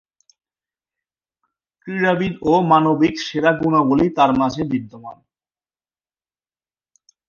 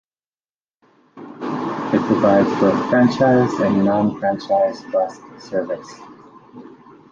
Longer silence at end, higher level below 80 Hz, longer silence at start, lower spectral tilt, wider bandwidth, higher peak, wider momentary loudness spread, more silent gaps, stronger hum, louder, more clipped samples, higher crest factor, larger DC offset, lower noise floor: first, 2.15 s vs 0.4 s; about the same, -52 dBFS vs -56 dBFS; first, 1.85 s vs 1.15 s; about the same, -6.5 dB/octave vs -7.5 dB/octave; about the same, 7.2 kHz vs 7.6 kHz; about the same, 0 dBFS vs -2 dBFS; second, 11 LU vs 14 LU; neither; neither; about the same, -17 LUFS vs -18 LUFS; neither; about the same, 20 dB vs 16 dB; neither; about the same, under -90 dBFS vs under -90 dBFS